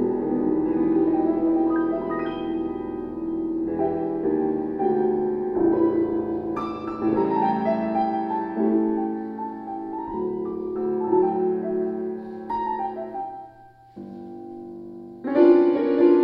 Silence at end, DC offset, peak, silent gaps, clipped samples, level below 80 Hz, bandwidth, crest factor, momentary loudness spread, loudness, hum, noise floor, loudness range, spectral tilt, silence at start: 0 s; under 0.1%; -4 dBFS; none; under 0.1%; -56 dBFS; 5.2 kHz; 18 dB; 13 LU; -24 LUFS; none; -49 dBFS; 3 LU; -10 dB/octave; 0 s